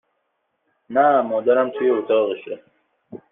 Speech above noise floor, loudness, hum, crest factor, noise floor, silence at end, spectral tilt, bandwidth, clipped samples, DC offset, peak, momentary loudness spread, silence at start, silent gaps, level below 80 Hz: 54 dB; -19 LUFS; none; 16 dB; -72 dBFS; 0.15 s; -9 dB/octave; 3.8 kHz; under 0.1%; under 0.1%; -6 dBFS; 14 LU; 0.9 s; none; -72 dBFS